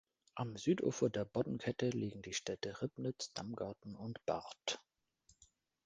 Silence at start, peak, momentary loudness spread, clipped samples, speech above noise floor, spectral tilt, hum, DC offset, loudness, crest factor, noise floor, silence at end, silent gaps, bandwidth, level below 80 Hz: 0.35 s; -20 dBFS; 10 LU; under 0.1%; 34 dB; -5 dB/octave; none; under 0.1%; -41 LUFS; 22 dB; -74 dBFS; 0.4 s; none; 10 kHz; -72 dBFS